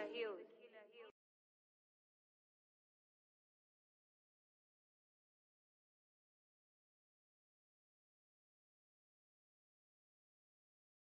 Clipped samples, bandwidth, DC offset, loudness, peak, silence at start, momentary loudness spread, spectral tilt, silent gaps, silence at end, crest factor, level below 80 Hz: under 0.1%; 4.5 kHz; under 0.1%; -52 LUFS; -34 dBFS; 0 s; 16 LU; 0 dB/octave; none; 10 s; 26 dB; under -90 dBFS